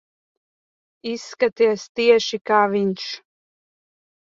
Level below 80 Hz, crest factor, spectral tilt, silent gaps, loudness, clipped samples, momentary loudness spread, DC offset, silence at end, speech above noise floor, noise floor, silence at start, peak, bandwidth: -70 dBFS; 20 dB; -4.5 dB/octave; 1.89-1.95 s; -20 LUFS; under 0.1%; 14 LU; under 0.1%; 1.05 s; over 70 dB; under -90 dBFS; 1.05 s; -4 dBFS; 7.6 kHz